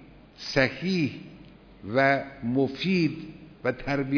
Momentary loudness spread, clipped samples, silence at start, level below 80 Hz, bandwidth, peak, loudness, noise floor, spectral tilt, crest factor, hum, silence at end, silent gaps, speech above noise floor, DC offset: 19 LU; under 0.1%; 0 s; -54 dBFS; 5.4 kHz; -8 dBFS; -26 LUFS; -49 dBFS; -6.5 dB/octave; 20 dB; none; 0 s; none; 23 dB; under 0.1%